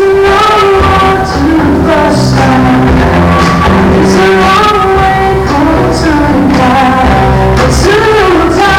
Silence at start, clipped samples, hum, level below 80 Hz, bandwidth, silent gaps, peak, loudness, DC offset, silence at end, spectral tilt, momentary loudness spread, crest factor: 0 s; under 0.1%; none; -18 dBFS; 18 kHz; none; -2 dBFS; -6 LUFS; under 0.1%; 0 s; -6 dB/octave; 3 LU; 4 dB